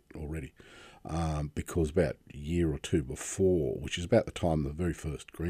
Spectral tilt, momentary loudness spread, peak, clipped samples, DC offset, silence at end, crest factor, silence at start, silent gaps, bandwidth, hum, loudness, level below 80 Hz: -6 dB/octave; 13 LU; -12 dBFS; under 0.1%; under 0.1%; 0 s; 20 dB; 0.15 s; none; 15.5 kHz; none; -32 LUFS; -46 dBFS